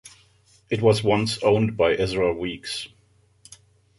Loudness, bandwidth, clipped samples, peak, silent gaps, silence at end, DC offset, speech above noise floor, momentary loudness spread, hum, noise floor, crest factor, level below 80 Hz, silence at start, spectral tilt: -22 LUFS; 11.5 kHz; under 0.1%; -6 dBFS; none; 1.1 s; under 0.1%; 39 dB; 11 LU; none; -60 dBFS; 18 dB; -50 dBFS; 0.05 s; -5.5 dB/octave